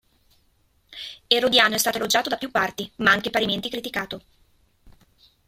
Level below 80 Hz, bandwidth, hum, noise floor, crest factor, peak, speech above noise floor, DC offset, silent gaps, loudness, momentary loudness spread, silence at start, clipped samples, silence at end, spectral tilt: -58 dBFS; 16.5 kHz; none; -64 dBFS; 24 dB; -2 dBFS; 41 dB; under 0.1%; none; -21 LUFS; 19 LU; 0.9 s; under 0.1%; 0.55 s; -2 dB/octave